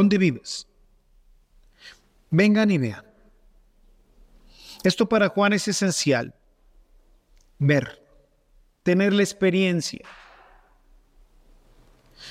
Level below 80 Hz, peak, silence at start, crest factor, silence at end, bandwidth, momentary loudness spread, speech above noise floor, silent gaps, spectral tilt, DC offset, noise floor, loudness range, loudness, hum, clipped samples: -58 dBFS; -6 dBFS; 0 s; 20 dB; 0 s; 14.5 kHz; 18 LU; 38 dB; none; -5.5 dB/octave; under 0.1%; -59 dBFS; 2 LU; -22 LUFS; none; under 0.1%